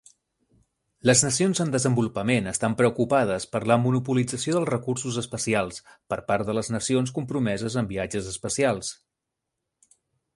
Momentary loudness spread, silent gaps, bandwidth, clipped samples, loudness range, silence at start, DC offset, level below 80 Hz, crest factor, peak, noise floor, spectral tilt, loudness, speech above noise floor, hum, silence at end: 8 LU; none; 11.5 kHz; under 0.1%; 5 LU; 1.05 s; under 0.1%; -56 dBFS; 20 dB; -4 dBFS; -84 dBFS; -4.5 dB/octave; -25 LUFS; 59 dB; none; 1.4 s